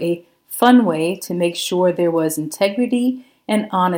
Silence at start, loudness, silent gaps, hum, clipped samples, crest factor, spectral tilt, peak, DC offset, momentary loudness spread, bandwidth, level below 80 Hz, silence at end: 0 s; -18 LUFS; none; none; under 0.1%; 18 dB; -5 dB/octave; 0 dBFS; under 0.1%; 10 LU; 17 kHz; -70 dBFS; 0 s